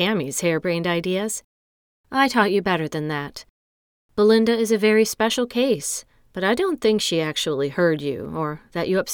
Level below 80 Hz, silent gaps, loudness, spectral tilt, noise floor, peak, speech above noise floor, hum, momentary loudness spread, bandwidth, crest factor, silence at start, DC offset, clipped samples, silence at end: -56 dBFS; 1.44-2.04 s, 3.50-4.09 s; -21 LUFS; -4 dB/octave; under -90 dBFS; -4 dBFS; over 69 dB; none; 10 LU; 19.5 kHz; 18 dB; 0 s; under 0.1%; under 0.1%; 0 s